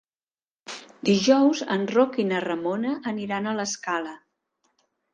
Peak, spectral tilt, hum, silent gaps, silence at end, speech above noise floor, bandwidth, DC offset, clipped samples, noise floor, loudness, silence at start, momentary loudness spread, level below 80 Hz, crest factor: -6 dBFS; -4.5 dB/octave; none; none; 0.95 s; over 67 dB; 9.8 kHz; under 0.1%; under 0.1%; under -90 dBFS; -24 LUFS; 0.7 s; 14 LU; -68 dBFS; 20 dB